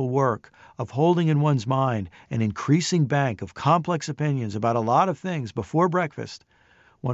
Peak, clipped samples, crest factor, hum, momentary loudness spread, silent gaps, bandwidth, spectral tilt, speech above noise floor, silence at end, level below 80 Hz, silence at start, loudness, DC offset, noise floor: -8 dBFS; under 0.1%; 16 dB; none; 11 LU; none; 8 kHz; -6.5 dB/octave; 35 dB; 0 s; -56 dBFS; 0 s; -24 LUFS; under 0.1%; -58 dBFS